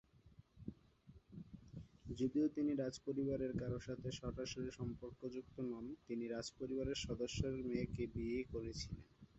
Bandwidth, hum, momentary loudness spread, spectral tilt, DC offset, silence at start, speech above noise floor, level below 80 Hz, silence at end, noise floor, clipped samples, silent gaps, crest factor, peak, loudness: 8 kHz; none; 15 LU; -6.5 dB/octave; under 0.1%; 0.25 s; 24 dB; -60 dBFS; 0 s; -67 dBFS; under 0.1%; none; 18 dB; -26 dBFS; -44 LUFS